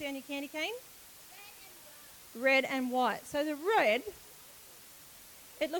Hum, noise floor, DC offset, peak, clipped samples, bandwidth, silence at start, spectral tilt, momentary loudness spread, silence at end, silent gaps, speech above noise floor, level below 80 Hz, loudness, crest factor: none; -54 dBFS; under 0.1%; -16 dBFS; under 0.1%; 19 kHz; 0 s; -2.5 dB/octave; 23 LU; 0 s; none; 22 dB; -72 dBFS; -32 LUFS; 20 dB